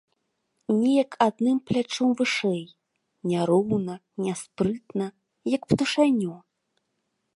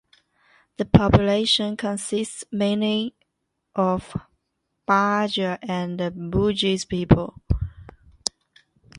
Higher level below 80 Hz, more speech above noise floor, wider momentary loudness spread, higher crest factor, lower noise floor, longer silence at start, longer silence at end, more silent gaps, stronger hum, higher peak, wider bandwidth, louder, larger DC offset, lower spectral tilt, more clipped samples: second, -62 dBFS vs -38 dBFS; about the same, 53 dB vs 56 dB; about the same, 11 LU vs 11 LU; about the same, 20 dB vs 24 dB; about the same, -77 dBFS vs -77 dBFS; about the same, 0.7 s vs 0.8 s; first, 1 s vs 0 s; neither; neither; second, -6 dBFS vs 0 dBFS; about the same, 11.5 kHz vs 11.5 kHz; about the same, -25 LUFS vs -23 LUFS; neither; about the same, -5.5 dB/octave vs -5.5 dB/octave; neither